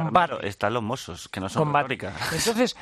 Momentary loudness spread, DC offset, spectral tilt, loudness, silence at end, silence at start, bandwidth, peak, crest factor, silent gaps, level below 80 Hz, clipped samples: 10 LU; under 0.1%; -4.5 dB/octave; -26 LUFS; 0 s; 0 s; 14 kHz; -6 dBFS; 20 dB; none; -56 dBFS; under 0.1%